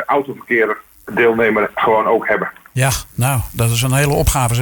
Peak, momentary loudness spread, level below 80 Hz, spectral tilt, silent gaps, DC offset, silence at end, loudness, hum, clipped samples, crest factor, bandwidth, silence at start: -2 dBFS; 6 LU; -32 dBFS; -5 dB/octave; none; under 0.1%; 0 s; -16 LUFS; none; under 0.1%; 14 dB; 19.5 kHz; 0 s